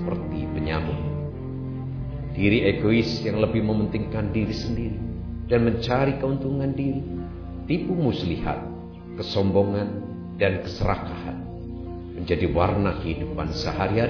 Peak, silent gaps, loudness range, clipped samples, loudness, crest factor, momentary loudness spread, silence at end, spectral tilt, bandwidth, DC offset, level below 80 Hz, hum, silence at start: -6 dBFS; none; 3 LU; under 0.1%; -26 LUFS; 18 dB; 12 LU; 0 s; -8 dB/octave; 5.4 kHz; 0.1%; -38 dBFS; none; 0 s